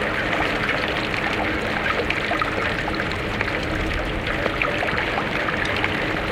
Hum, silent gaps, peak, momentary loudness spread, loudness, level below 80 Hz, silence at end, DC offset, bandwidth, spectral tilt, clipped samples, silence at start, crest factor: none; none; -4 dBFS; 3 LU; -22 LUFS; -36 dBFS; 0 s; under 0.1%; 17 kHz; -5 dB/octave; under 0.1%; 0 s; 20 dB